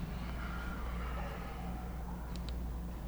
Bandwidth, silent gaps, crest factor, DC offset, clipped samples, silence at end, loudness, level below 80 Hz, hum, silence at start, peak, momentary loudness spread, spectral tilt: over 20 kHz; none; 12 dB; under 0.1%; under 0.1%; 0 s; -42 LUFS; -42 dBFS; none; 0 s; -28 dBFS; 2 LU; -6.5 dB/octave